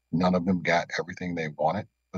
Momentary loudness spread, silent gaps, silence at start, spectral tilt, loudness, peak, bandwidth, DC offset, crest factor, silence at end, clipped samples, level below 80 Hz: 8 LU; none; 0.1 s; -6.5 dB/octave; -27 LUFS; -12 dBFS; 7.2 kHz; under 0.1%; 16 dB; 0 s; under 0.1%; -62 dBFS